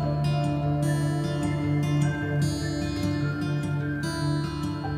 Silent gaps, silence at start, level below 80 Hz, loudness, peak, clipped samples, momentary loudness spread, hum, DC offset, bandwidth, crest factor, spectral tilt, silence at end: none; 0 s; -44 dBFS; -27 LUFS; -12 dBFS; under 0.1%; 3 LU; none; under 0.1%; 13.5 kHz; 14 dB; -6.5 dB/octave; 0 s